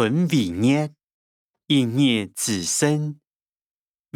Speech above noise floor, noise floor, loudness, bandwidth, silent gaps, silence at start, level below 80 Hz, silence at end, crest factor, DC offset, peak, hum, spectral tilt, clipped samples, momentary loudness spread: over 69 dB; under -90 dBFS; -21 LUFS; 16.5 kHz; 1.12-1.50 s; 0 s; -66 dBFS; 1 s; 16 dB; under 0.1%; -6 dBFS; none; -4.5 dB/octave; under 0.1%; 6 LU